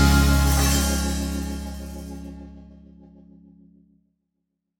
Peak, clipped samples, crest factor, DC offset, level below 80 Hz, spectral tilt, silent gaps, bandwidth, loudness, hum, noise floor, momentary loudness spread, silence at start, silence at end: -4 dBFS; under 0.1%; 20 dB; under 0.1%; -26 dBFS; -4.5 dB/octave; none; over 20 kHz; -22 LUFS; none; -79 dBFS; 21 LU; 0 s; 2.15 s